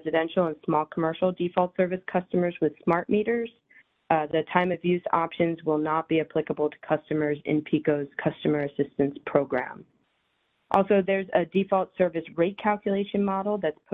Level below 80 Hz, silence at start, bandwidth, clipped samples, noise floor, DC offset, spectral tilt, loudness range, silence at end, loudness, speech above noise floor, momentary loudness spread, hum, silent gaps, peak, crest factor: -62 dBFS; 0.05 s; 4.2 kHz; under 0.1%; -72 dBFS; under 0.1%; -9.5 dB/octave; 2 LU; 0.2 s; -26 LUFS; 47 dB; 4 LU; none; none; -4 dBFS; 22 dB